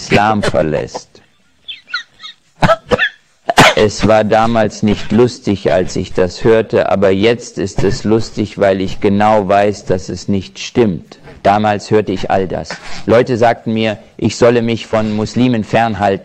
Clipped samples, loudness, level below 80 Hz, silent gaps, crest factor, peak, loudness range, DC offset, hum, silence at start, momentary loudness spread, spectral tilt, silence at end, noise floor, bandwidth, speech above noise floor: under 0.1%; -13 LUFS; -34 dBFS; none; 14 dB; 0 dBFS; 3 LU; under 0.1%; none; 0 s; 11 LU; -5.5 dB/octave; 0 s; -52 dBFS; 15.5 kHz; 39 dB